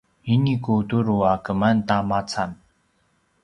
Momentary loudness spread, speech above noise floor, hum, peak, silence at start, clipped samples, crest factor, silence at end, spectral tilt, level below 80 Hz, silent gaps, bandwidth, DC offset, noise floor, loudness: 6 LU; 45 dB; none; -4 dBFS; 0.25 s; under 0.1%; 18 dB; 0.9 s; -7 dB/octave; -50 dBFS; none; 10.5 kHz; under 0.1%; -66 dBFS; -22 LUFS